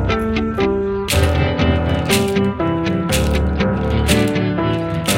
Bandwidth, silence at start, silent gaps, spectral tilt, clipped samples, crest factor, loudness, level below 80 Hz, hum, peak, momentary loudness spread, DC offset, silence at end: 17 kHz; 0 s; none; -5.5 dB/octave; under 0.1%; 16 dB; -17 LUFS; -26 dBFS; none; 0 dBFS; 4 LU; under 0.1%; 0 s